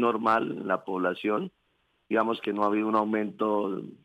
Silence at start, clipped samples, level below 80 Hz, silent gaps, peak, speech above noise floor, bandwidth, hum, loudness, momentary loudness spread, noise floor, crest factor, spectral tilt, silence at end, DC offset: 0 s; under 0.1%; -76 dBFS; none; -10 dBFS; 45 dB; 9.6 kHz; none; -28 LUFS; 5 LU; -72 dBFS; 18 dB; -7.5 dB/octave; 0.1 s; under 0.1%